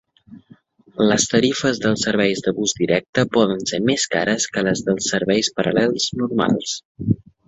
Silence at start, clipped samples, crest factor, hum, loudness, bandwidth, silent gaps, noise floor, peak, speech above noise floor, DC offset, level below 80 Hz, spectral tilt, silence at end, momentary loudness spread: 0.3 s; under 0.1%; 18 dB; none; -19 LUFS; 8.4 kHz; 3.09-3.13 s, 6.85-6.95 s; -51 dBFS; -2 dBFS; 31 dB; under 0.1%; -52 dBFS; -4 dB/octave; 0.3 s; 5 LU